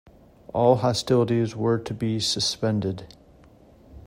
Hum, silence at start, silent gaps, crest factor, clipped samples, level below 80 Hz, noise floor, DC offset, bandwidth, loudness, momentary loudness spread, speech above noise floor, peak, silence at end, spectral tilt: none; 0.55 s; none; 18 dB; under 0.1%; -54 dBFS; -52 dBFS; under 0.1%; 16 kHz; -24 LUFS; 9 LU; 29 dB; -6 dBFS; 0.05 s; -5.5 dB/octave